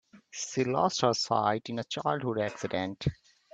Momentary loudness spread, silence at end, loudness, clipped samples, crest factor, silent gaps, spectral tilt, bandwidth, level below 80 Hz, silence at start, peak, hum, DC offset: 9 LU; 0.4 s; -30 LUFS; under 0.1%; 22 dB; none; -4.5 dB/octave; 9.2 kHz; -58 dBFS; 0.15 s; -10 dBFS; none; under 0.1%